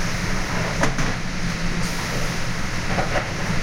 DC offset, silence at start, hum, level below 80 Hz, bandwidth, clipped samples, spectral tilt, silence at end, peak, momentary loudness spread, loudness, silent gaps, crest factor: under 0.1%; 0 s; none; -28 dBFS; 16 kHz; under 0.1%; -4.5 dB/octave; 0 s; -6 dBFS; 4 LU; -24 LUFS; none; 16 dB